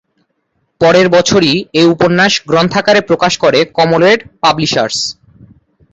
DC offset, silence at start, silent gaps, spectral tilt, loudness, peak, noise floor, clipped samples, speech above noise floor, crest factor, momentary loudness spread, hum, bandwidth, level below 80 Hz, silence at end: under 0.1%; 0.8 s; none; -4.5 dB/octave; -10 LUFS; 0 dBFS; -64 dBFS; under 0.1%; 54 dB; 12 dB; 5 LU; none; 8.4 kHz; -48 dBFS; 0.8 s